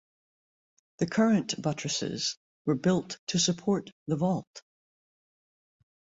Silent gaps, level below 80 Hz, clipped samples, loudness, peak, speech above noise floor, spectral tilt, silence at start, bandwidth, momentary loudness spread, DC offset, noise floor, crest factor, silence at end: 2.37-2.65 s, 3.19-3.27 s, 3.92-4.06 s, 4.47-4.54 s; -68 dBFS; under 0.1%; -29 LUFS; -14 dBFS; over 61 dB; -4.5 dB/octave; 1 s; 8 kHz; 8 LU; under 0.1%; under -90 dBFS; 18 dB; 1.55 s